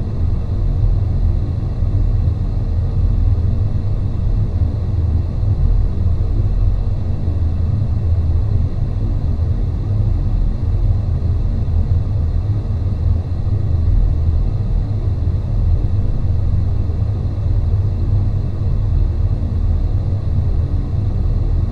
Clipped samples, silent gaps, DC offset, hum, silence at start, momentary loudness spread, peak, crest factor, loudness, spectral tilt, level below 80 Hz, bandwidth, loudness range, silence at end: under 0.1%; none; under 0.1%; none; 0 s; 3 LU; -2 dBFS; 12 dB; -19 LUFS; -10 dB/octave; -20 dBFS; 4.8 kHz; 1 LU; 0 s